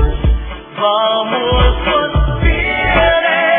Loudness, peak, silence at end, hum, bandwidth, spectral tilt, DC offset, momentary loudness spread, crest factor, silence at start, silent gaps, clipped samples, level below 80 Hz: -14 LUFS; 0 dBFS; 0 s; none; 3.7 kHz; -9 dB/octave; under 0.1%; 6 LU; 12 dB; 0 s; none; under 0.1%; -18 dBFS